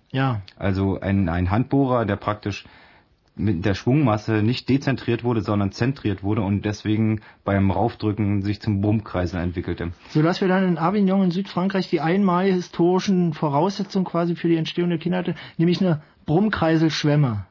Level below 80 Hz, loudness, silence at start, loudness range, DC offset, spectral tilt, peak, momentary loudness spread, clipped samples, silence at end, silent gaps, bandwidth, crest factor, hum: -52 dBFS; -22 LUFS; 0.15 s; 3 LU; under 0.1%; -7.5 dB/octave; -4 dBFS; 6 LU; under 0.1%; 0.05 s; none; 6 kHz; 16 dB; none